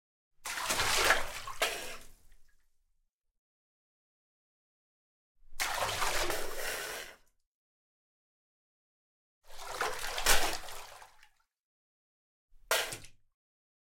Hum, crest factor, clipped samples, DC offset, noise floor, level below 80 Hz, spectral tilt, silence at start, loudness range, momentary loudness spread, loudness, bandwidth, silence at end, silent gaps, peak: none; 28 dB; under 0.1%; under 0.1%; -77 dBFS; -48 dBFS; -0.5 dB/octave; 0.4 s; 10 LU; 19 LU; -32 LUFS; 16.5 kHz; 0.8 s; 3.09-3.19 s, 3.38-5.35 s, 7.46-9.41 s, 11.60-12.48 s; -8 dBFS